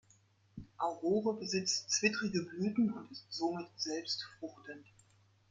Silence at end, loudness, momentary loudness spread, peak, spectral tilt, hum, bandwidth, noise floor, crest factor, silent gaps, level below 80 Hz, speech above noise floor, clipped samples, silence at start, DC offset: 0.7 s; -36 LUFS; 20 LU; -16 dBFS; -3.5 dB/octave; none; 9.6 kHz; -69 dBFS; 22 dB; none; -72 dBFS; 32 dB; under 0.1%; 0.55 s; under 0.1%